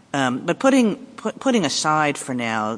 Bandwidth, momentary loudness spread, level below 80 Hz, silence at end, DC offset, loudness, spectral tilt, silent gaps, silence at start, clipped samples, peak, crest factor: 10.5 kHz; 8 LU; -66 dBFS; 0 s; under 0.1%; -20 LUFS; -4 dB/octave; none; 0.15 s; under 0.1%; -4 dBFS; 16 dB